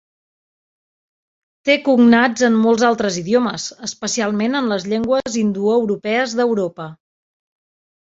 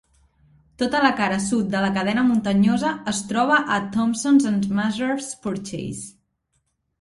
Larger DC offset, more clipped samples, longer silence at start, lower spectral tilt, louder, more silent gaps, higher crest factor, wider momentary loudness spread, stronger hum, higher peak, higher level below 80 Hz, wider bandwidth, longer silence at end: neither; neither; first, 1.65 s vs 0.8 s; about the same, -4.5 dB/octave vs -5 dB/octave; first, -17 LUFS vs -21 LUFS; neither; about the same, 18 dB vs 20 dB; about the same, 12 LU vs 11 LU; neither; about the same, 0 dBFS vs -2 dBFS; about the same, -60 dBFS vs -56 dBFS; second, 7.8 kHz vs 11.5 kHz; first, 1.15 s vs 0.9 s